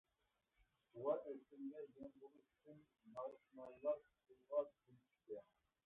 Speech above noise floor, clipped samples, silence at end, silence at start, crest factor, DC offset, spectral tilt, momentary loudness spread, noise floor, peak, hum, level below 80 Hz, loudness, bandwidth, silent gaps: 38 dB; under 0.1%; 0.45 s; 0.95 s; 22 dB; under 0.1%; -4.5 dB/octave; 22 LU; -88 dBFS; -30 dBFS; none; -88 dBFS; -50 LUFS; 3.8 kHz; none